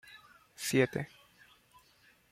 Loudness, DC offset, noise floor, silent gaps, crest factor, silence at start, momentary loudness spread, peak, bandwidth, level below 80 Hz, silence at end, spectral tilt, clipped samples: -32 LUFS; under 0.1%; -66 dBFS; none; 24 dB; 0.05 s; 25 LU; -12 dBFS; 16 kHz; -72 dBFS; 1.25 s; -4.5 dB/octave; under 0.1%